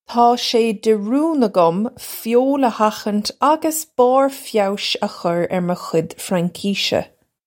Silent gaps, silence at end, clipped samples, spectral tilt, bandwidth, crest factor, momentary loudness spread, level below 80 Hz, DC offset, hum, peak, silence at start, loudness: none; 0.4 s; under 0.1%; -4.5 dB/octave; 17 kHz; 16 dB; 7 LU; -62 dBFS; under 0.1%; none; -2 dBFS; 0.1 s; -18 LUFS